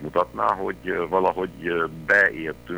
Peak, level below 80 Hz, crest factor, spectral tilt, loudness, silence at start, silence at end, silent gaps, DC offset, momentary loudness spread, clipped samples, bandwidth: -6 dBFS; -50 dBFS; 16 dB; -6 dB/octave; -23 LUFS; 0 s; 0 s; none; under 0.1%; 9 LU; under 0.1%; over 20 kHz